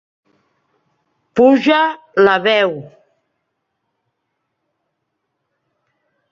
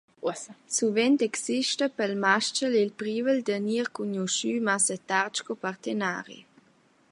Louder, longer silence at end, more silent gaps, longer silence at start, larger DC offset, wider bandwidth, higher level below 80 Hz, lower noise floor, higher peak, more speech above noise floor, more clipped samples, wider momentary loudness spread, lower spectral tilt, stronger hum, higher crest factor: first, -14 LUFS vs -27 LUFS; first, 3.45 s vs 0.7 s; neither; first, 1.35 s vs 0.2 s; neither; second, 7.4 kHz vs 11.5 kHz; first, -64 dBFS vs -80 dBFS; first, -73 dBFS vs -63 dBFS; first, 0 dBFS vs -6 dBFS; first, 60 dB vs 36 dB; neither; about the same, 10 LU vs 10 LU; first, -6 dB/octave vs -3 dB/octave; neither; about the same, 18 dB vs 22 dB